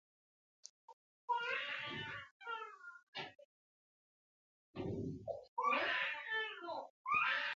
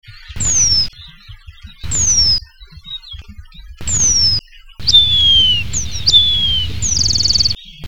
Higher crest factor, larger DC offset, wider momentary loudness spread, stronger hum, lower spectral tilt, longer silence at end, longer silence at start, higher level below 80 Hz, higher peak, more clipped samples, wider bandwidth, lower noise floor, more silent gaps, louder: about the same, 20 dB vs 16 dB; second, under 0.1% vs 5%; first, 21 LU vs 13 LU; neither; about the same, -1 dB/octave vs 0 dB/octave; about the same, 0 s vs 0 s; first, 0.65 s vs 0 s; second, -72 dBFS vs -30 dBFS; second, -24 dBFS vs 0 dBFS; neither; second, 7.4 kHz vs 18 kHz; first, under -90 dBFS vs -37 dBFS; first, 0.70-1.28 s, 2.31-2.40 s, 3.03-3.13 s, 3.45-4.74 s, 5.48-5.57 s, 6.90-7.05 s vs none; second, -40 LUFS vs -11 LUFS